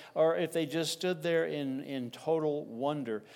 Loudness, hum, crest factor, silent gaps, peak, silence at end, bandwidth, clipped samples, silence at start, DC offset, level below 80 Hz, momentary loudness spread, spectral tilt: -33 LUFS; none; 16 dB; none; -16 dBFS; 0 s; 17.5 kHz; under 0.1%; 0 s; under 0.1%; -86 dBFS; 8 LU; -5 dB/octave